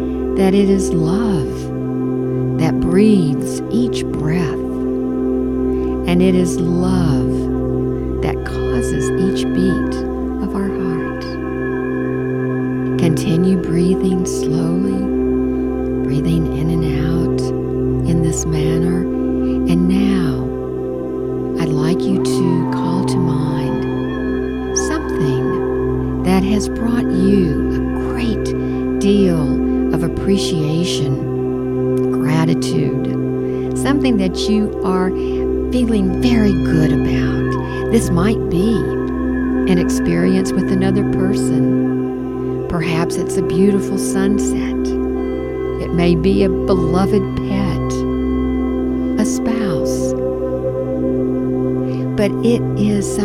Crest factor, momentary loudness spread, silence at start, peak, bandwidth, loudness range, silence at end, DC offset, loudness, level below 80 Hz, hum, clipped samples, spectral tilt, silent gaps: 16 dB; 6 LU; 0 s; 0 dBFS; 14 kHz; 2 LU; 0 s; under 0.1%; -17 LUFS; -30 dBFS; none; under 0.1%; -7 dB/octave; none